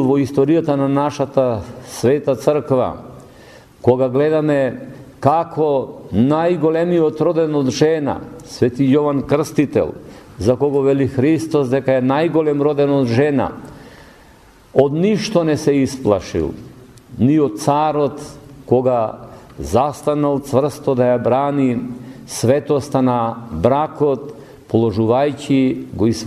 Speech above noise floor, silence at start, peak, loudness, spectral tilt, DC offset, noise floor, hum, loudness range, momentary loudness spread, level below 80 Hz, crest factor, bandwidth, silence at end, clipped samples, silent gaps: 30 dB; 0 s; 0 dBFS; -17 LUFS; -7 dB/octave; under 0.1%; -46 dBFS; none; 2 LU; 9 LU; -46 dBFS; 16 dB; 13.5 kHz; 0 s; under 0.1%; none